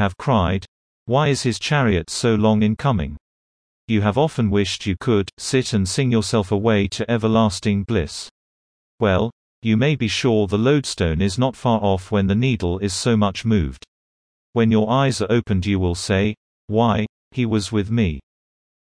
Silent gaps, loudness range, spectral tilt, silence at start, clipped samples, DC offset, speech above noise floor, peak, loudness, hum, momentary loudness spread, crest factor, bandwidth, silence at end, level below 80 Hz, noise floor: 0.68-1.06 s, 3.21-3.88 s, 5.33-5.37 s, 8.31-8.98 s, 9.32-9.62 s, 13.88-14.53 s, 16.37-16.68 s, 17.09-17.31 s; 2 LU; -6 dB/octave; 0 s; under 0.1%; under 0.1%; over 71 dB; -4 dBFS; -20 LUFS; none; 6 LU; 16 dB; 10.5 kHz; 0.7 s; -40 dBFS; under -90 dBFS